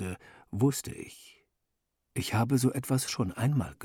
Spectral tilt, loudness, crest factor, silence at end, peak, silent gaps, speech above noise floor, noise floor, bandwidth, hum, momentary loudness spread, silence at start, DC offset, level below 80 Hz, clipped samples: -5.5 dB/octave; -30 LUFS; 16 dB; 0 s; -14 dBFS; none; 52 dB; -82 dBFS; 18 kHz; none; 15 LU; 0 s; under 0.1%; -60 dBFS; under 0.1%